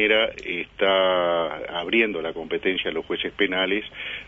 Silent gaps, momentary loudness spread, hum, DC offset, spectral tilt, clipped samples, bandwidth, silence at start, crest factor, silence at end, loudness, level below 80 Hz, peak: none; 10 LU; none; under 0.1%; -5.5 dB/octave; under 0.1%; 7.4 kHz; 0 s; 18 dB; 0 s; -23 LUFS; -54 dBFS; -6 dBFS